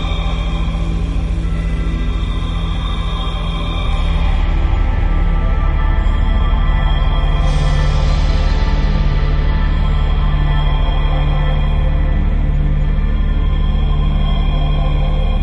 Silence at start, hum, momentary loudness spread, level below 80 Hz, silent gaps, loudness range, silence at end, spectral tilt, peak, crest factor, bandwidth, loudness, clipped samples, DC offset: 0 s; none; 4 LU; -14 dBFS; none; 3 LU; 0 s; -7 dB/octave; -2 dBFS; 10 dB; 6.4 kHz; -18 LUFS; under 0.1%; under 0.1%